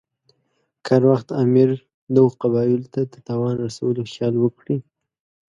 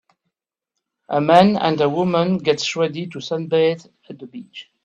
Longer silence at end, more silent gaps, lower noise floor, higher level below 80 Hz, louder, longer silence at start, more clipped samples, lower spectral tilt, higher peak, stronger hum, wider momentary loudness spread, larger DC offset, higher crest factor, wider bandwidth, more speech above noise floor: first, 0.7 s vs 0.2 s; first, 1.94-2.07 s vs none; second, -70 dBFS vs -81 dBFS; about the same, -62 dBFS vs -60 dBFS; about the same, -20 LUFS vs -18 LUFS; second, 0.85 s vs 1.1 s; neither; first, -8.5 dB/octave vs -6 dB/octave; about the same, -2 dBFS vs 0 dBFS; neither; second, 11 LU vs 23 LU; neither; about the same, 18 dB vs 20 dB; second, 7.8 kHz vs 9 kHz; second, 51 dB vs 62 dB